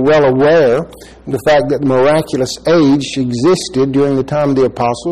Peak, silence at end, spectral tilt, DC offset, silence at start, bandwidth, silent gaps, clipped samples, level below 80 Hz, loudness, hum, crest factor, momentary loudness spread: -2 dBFS; 0 s; -6 dB/octave; 0.5%; 0 s; 14 kHz; none; under 0.1%; -42 dBFS; -12 LUFS; none; 10 dB; 8 LU